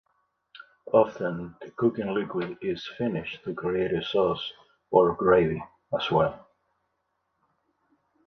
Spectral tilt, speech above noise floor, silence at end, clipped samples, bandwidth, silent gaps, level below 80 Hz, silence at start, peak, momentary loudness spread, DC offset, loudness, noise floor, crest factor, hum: -7.5 dB/octave; 51 dB; 1.9 s; under 0.1%; 6.4 kHz; none; -58 dBFS; 0.55 s; -6 dBFS; 12 LU; under 0.1%; -26 LUFS; -77 dBFS; 22 dB; none